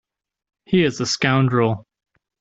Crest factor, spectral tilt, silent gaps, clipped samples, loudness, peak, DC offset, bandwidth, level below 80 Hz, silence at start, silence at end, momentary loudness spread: 18 dB; -5.5 dB/octave; none; under 0.1%; -19 LUFS; -4 dBFS; under 0.1%; 8 kHz; -56 dBFS; 0.7 s; 0.6 s; 5 LU